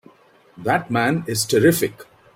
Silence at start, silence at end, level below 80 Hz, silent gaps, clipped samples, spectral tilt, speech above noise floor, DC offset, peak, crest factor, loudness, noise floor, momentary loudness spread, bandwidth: 0.55 s; 0.3 s; -56 dBFS; none; under 0.1%; -4.5 dB/octave; 34 dB; under 0.1%; -4 dBFS; 18 dB; -20 LUFS; -53 dBFS; 9 LU; 16.5 kHz